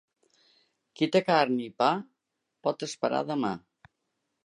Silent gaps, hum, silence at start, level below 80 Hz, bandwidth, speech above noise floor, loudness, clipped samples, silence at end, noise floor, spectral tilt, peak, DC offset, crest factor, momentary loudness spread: none; none; 1 s; -76 dBFS; 11 kHz; 56 dB; -28 LUFS; under 0.1%; 0.85 s; -83 dBFS; -5 dB/octave; -10 dBFS; under 0.1%; 22 dB; 10 LU